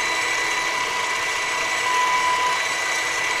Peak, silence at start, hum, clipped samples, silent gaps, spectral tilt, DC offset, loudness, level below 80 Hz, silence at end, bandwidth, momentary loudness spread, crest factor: -10 dBFS; 0 s; none; under 0.1%; none; 0.5 dB/octave; under 0.1%; -21 LUFS; -56 dBFS; 0 s; 15.5 kHz; 3 LU; 14 dB